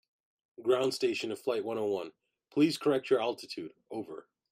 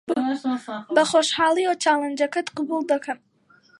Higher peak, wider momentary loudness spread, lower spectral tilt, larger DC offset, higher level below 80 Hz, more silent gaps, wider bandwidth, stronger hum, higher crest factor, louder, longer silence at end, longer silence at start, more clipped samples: second, -14 dBFS vs -4 dBFS; first, 14 LU vs 9 LU; first, -5 dB/octave vs -2.5 dB/octave; neither; second, -80 dBFS vs -70 dBFS; neither; first, 15.5 kHz vs 11.5 kHz; neither; about the same, 18 dB vs 20 dB; second, -32 LUFS vs -22 LUFS; second, 0.3 s vs 0.65 s; first, 0.6 s vs 0.1 s; neither